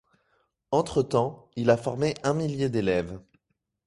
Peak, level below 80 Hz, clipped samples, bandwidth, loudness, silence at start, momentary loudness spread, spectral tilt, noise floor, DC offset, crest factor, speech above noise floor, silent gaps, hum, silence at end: -8 dBFS; -54 dBFS; under 0.1%; 11.5 kHz; -26 LUFS; 0.7 s; 6 LU; -6.5 dB/octave; -77 dBFS; under 0.1%; 20 dB; 52 dB; none; none; 0.65 s